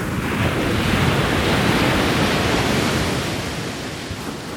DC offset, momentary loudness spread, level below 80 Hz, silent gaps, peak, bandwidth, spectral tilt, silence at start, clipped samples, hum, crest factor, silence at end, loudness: under 0.1%; 10 LU; -34 dBFS; none; -4 dBFS; 18 kHz; -5 dB/octave; 0 s; under 0.1%; none; 16 dB; 0 s; -20 LUFS